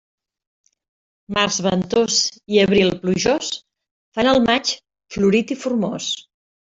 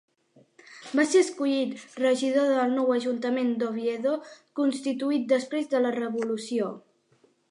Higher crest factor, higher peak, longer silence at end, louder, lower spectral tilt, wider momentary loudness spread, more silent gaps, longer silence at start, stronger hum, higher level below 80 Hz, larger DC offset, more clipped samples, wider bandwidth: about the same, 18 dB vs 16 dB; first, -2 dBFS vs -10 dBFS; second, 0.4 s vs 0.7 s; first, -19 LUFS vs -26 LUFS; about the same, -4 dB/octave vs -4 dB/octave; first, 12 LU vs 8 LU; first, 3.91-4.12 s vs none; first, 1.3 s vs 0.7 s; neither; first, -52 dBFS vs -82 dBFS; neither; neither; second, 7.8 kHz vs 11.5 kHz